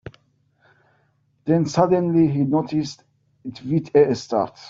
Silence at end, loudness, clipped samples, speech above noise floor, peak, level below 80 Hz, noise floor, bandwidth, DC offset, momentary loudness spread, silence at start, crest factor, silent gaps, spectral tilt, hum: 0 s; -20 LUFS; under 0.1%; 45 dB; -4 dBFS; -58 dBFS; -64 dBFS; 7.8 kHz; under 0.1%; 15 LU; 0.05 s; 18 dB; none; -7.5 dB/octave; none